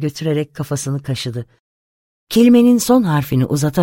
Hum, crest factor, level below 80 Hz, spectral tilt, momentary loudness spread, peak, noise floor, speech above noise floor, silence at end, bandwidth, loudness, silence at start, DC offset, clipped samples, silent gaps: none; 14 dB; -48 dBFS; -6 dB/octave; 12 LU; -2 dBFS; under -90 dBFS; over 75 dB; 0 s; 17 kHz; -16 LUFS; 0 s; under 0.1%; under 0.1%; 1.59-2.27 s